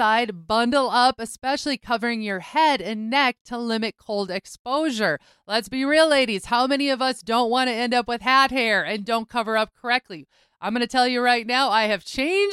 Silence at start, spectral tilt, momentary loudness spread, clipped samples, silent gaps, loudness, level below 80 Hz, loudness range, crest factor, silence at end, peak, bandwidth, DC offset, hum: 0 s; -3.5 dB/octave; 9 LU; under 0.1%; 3.41-3.45 s, 4.59-4.65 s; -22 LUFS; -58 dBFS; 3 LU; 18 dB; 0 s; -6 dBFS; 14.5 kHz; under 0.1%; none